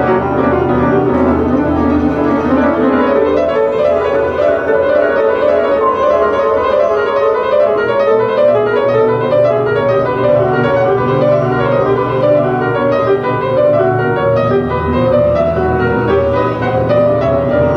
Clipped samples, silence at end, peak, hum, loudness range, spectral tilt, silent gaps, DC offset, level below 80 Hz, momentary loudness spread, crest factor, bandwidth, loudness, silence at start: under 0.1%; 0 s; -2 dBFS; none; 1 LU; -8.5 dB/octave; none; under 0.1%; -34 dBFS; 2 LU; 10 dB; 6.4 kHz; -12 LUFS; 0 s